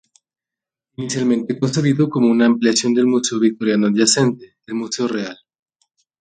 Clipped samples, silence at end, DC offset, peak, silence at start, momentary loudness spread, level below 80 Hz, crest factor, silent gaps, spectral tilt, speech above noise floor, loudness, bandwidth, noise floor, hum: under 0.1%; 0.85 s; under 0.1%; 0 dBFS; 1 s; 12 LU; -62 dBFS; 18 dB; none; -4.5 dB/octave; 71 dB; -17 LUFS; 9.6 kHz; -88 dBFS; none